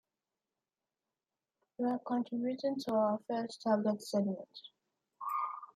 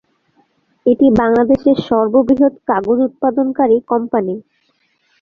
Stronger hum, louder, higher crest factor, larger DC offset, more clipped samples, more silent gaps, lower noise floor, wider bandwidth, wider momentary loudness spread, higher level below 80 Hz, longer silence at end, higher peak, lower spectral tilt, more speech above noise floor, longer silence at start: neither; second, -36 LUFS vs -14 LUFS; about the same, 18 dB vs 14 dB; neither; neither; neither; first, under -90 dBFS vs -61 dBFS; first, 15 kHz vs 5 kHz; about the same, 9 LU vs 7 LU; second, -86 dBFS vs -48 dBFS; second, 0.1 s vs 0.8 s; second, -18 dBFS vs -2 dBFS; second, -6.5 dB/octave vs -8.5 dB/octave; first, over 55 dB vs 48 dB; first, 1.8 s vs 0.85 s